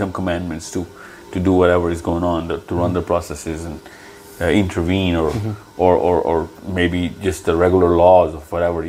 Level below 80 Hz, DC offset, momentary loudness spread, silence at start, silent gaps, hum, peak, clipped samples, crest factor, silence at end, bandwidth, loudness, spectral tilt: -42 dBFS; under 0.1%; 13 LU; 0 s; none; none; 0 dBFS; under 0.1%; 18 dB; 0 s; 16 kHz; -18 LUFS; -6.5 dB/octave